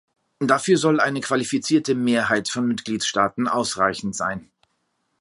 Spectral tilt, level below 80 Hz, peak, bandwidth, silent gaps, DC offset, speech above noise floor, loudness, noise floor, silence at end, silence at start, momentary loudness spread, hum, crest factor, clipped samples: -4 dB/octave; -60 dBFS; -2 dBFS; 11.5 kHz; none; under 0.1%; 50 dB; -21 LUFS; -72 dBFS; 0.75 s; 0.4 s; 8 LU; none; 20 dB; under 0.1%